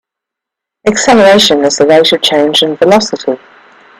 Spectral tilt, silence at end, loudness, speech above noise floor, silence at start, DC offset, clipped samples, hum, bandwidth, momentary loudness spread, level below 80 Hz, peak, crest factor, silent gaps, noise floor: -3 dB/octave; 0.65 s; -8 LUFS; 72 dB; 0.85 s; under 0.1%; 0.2%; none; 15 kHz; 11 LU; -48 dBFS; 0 dBFS; 10 dB; none; -80 dBFS